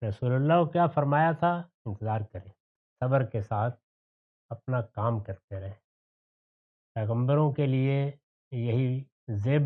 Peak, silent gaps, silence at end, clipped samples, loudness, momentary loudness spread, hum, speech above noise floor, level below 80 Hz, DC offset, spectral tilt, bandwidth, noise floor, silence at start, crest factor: -12 dBFS; 1.74-1.85 s, 2.60-2.96 s, 3.83-4.49 s, 5.44-5.48 s, 5.84-6.95 s, 8.23-8.51 s, 9.12-9.27 s; 0 s; under 0.1%; -28 LUFS; 16 LU; none; over 63 dB; -68 dBFS; under 0.1%; -10.5 dB/octave; 4.1 kHz; under -90 dBFS; 0 s; 18 dB